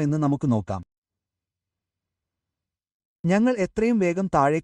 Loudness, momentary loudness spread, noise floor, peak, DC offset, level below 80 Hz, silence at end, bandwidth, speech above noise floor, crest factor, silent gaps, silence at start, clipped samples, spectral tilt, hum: -23 LUFS; 9 LU; -88 dBFS; -8 dBFS; under 0.1%; -54 dBFS; 0 s; 10.5 kHz; 66 dB; 18 dB; 0.98-1.02 s, 2.94-3.24 s; 0 s; under 0.1%; -7.5 dB/octave; none